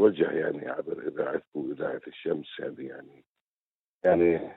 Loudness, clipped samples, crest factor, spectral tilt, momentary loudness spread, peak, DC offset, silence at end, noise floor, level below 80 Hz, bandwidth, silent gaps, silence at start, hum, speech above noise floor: -29 LUFS; under 0.1%; 20 dB; -9.5 dB/octave; 15 LU; -8 dBFS; under 0.1%; 0 s; under -90 dBFS; -66 dBFS; 4.1 kHz; 1.47-1.52 s, 3.27-3.35 s, 3.41-4.00 s; 0 s; none; over 62 dB